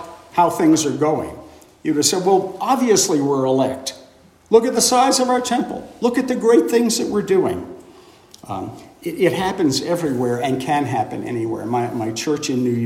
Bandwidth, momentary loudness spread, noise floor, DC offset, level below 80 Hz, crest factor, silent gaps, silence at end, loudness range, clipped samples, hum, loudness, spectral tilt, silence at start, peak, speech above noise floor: 16 kHz; 14 LU; -48 dBFS; under 0.1%; -58 dBFS; 18 dB; none; 0 s; 4 LU; under 0.1%; none; -18 LUFS; -4 dB/octave; 0 s; -2 dBFS; 30 dB